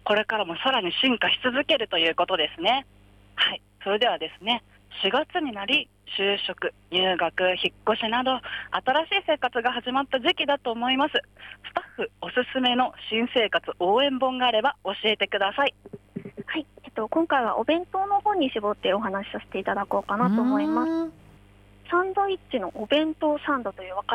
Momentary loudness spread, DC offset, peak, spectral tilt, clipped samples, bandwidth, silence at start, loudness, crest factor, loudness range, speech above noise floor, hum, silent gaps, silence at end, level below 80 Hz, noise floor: 10 LU; under 0.1%; -10 dBFS; -5.5 dB/octave; under 0.1%; 12.5 kHz; 0.05 s; -25 LUFS; 16 dB; 3 LU; 28 dB; none; none; 0 s; -60 dBFS; -53 dBFS